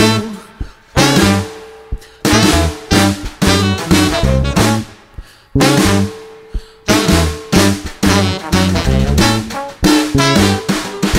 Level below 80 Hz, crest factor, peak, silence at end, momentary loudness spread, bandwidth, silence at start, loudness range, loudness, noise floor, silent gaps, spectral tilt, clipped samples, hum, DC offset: -24 dBFS; 14 dB; 0 dBFS; 0 s; 19 LU; 16.5 kHz; 0 s; 2 LU; -13 LUFS; -34 dBFS; none; -4.5 dB/octave; under 0.1%; none; under 0.1%